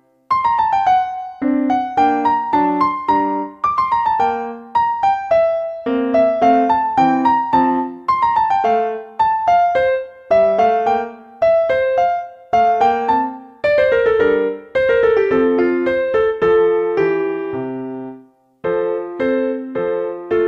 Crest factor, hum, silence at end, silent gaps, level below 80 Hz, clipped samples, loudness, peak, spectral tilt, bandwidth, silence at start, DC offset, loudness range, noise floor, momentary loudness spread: 14 dB; none; 0 s; none; -50 dBFS; under 0.1%; -16 LUFS; -2 dBFS; -6.5 dB/octave; 7 kHz; 0.3 s; under 0.1%; 3 LU; -45 dBFS; 8 LU